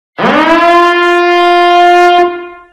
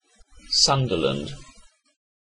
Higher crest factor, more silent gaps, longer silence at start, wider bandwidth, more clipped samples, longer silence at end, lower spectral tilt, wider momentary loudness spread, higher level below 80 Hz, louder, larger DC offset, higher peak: second, 8 dB vs 20 dB; neither; second, 0.2 s vs 0.45 s; about the same, 11.5 kHz vs 10.5 kHz; neither; second, 0.15 s vs 0.8 s; about the same, -4.5 dB/octave vs -3.5 dB/octave; second, 5 LU vs 19 LU; about the same, -46 dBFS vs -48 dBFS; first, -7 LUFS vs -21 LUFS; neither; first, 0 dBFS vs -6 dBFS